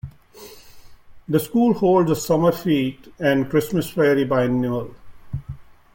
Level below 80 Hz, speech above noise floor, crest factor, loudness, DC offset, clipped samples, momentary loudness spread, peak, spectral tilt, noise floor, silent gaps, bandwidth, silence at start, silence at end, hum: -50 dBFS; 25 dB; 16 dB; -20 LUFS; under 0.1%; under 0.1%; 17 LU; -6 dBFS; -6.5 dB/octave; -44 dBFS; none; 17 kHz; 0.05 s; 0.3 s; none